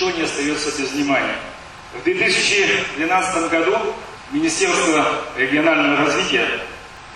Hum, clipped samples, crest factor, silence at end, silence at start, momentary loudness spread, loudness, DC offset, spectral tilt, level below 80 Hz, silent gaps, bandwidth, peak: none; under 0.1%; 16 dB; 0 s; 0 s; 12 LU; -18 LUFS; under 0.1%; -2.5 dB/octave; -50 dBFS; none; 12.5 kHz; -4 dBFS